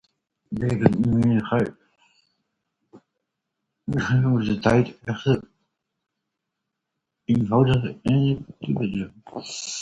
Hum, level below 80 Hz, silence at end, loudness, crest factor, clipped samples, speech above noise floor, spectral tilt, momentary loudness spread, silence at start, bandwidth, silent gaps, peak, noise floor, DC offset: none; -48 dBFS; 0 s; -23 LUFS; 24 dB; under 0.1%; 60 dB; -7 dB/octave; 12 LU; 0.5 s; 9 kHz; none; 0 dBFS; -82 dBFS; under 0.1%